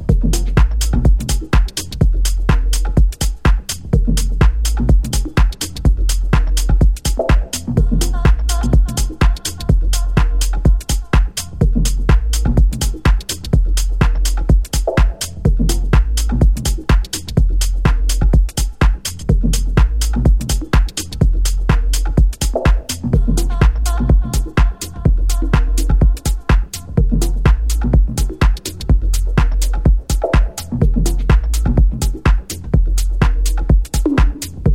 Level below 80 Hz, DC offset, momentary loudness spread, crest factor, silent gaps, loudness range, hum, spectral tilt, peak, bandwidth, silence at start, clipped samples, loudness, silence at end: -14 dBFS; under 0.1%; 3 LU; 14 dB; none; 1 LU; none; -5.5 dB/octave; 0 dBFS; 16 kHz; 0 s; under 0.1%; -17 LUFS; 0 s